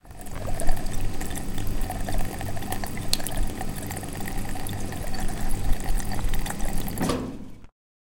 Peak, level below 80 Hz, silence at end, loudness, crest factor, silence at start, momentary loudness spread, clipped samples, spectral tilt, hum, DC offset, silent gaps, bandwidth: 0 dBFS; -28 dBFS; 0.5 s; -31 LUFS; 22 dB; 0.05 s; 6 LU; under 0.1%; -4.5 dB/octave; none; under 0.1%; none; 17 kHz